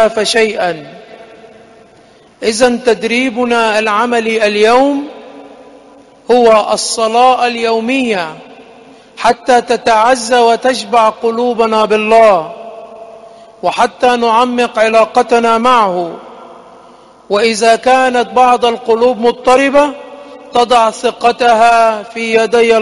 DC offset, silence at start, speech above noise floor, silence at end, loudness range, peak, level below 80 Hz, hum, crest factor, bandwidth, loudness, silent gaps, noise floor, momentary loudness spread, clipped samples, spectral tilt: under 0.1%; 0 s; 33 dB; 0 s; 2 LU; 0 dBFS; -50 dBFS; none; 12 dB; 11.5 kHz; -11 LUFS; none; -43 dBFS; 9 LU; under 0.1%; -3 dB/octave